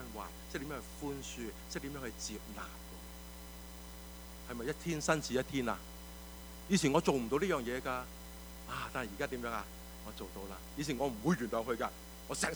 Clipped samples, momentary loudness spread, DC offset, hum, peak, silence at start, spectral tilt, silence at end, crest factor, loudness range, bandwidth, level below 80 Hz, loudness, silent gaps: under 0.1%; 16 LU; under 0.1%; none; -16 dBFS; 0 s; -4.5 dB/octave; 0 s; 24 dB; 10 LU; over 20 kHz; -52 dBFS; -38 LUFS; none